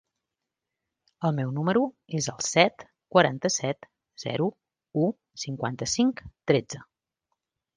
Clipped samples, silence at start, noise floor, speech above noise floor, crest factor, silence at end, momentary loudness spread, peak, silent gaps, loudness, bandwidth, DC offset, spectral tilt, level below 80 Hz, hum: under 0.1%; 1.2 s; -86 dBFS; 60 dB; 24 dB; 0.95 s; 14 LU; -4 dBFS; none; -27 LUFS; 10.5 kHz; under 0.1%; -4.5 dB/octave; -62 dBFS; none